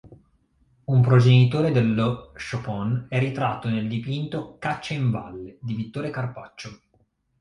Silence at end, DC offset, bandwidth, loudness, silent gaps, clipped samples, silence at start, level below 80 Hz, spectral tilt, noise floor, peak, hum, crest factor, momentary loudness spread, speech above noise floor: 0.65 s; under 0.1%; 7.2 kHz; -23 LUFS; none; under 0.1%; 0.05 s; -54 dBFS; -8 dB/octave; -66 dBFS; -6 dBFS; none; 18 dB; 19 LU; 43 dB